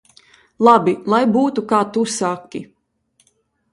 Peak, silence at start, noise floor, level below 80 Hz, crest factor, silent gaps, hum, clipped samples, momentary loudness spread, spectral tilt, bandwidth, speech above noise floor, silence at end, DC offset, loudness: 0 dBFS; 0.6 s; -64 dBFS; -64 dBFS; 18 dB; none; none; under 0.1%; 15 LU; -5 dB/octave; 11.5 kHz; 48 dB; 1.1 s; under 0.1%; -16 LUFS